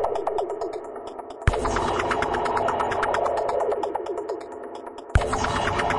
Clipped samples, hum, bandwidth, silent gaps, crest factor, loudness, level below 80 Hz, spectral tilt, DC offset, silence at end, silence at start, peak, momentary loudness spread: under 0.1%; none; 11.5 kHz; none; 20 dB; -25 LUFS; -36 dBFS; -5 dB/octave; under 0.1%; 0 s; 0 s; -6 dBFS; 12 LU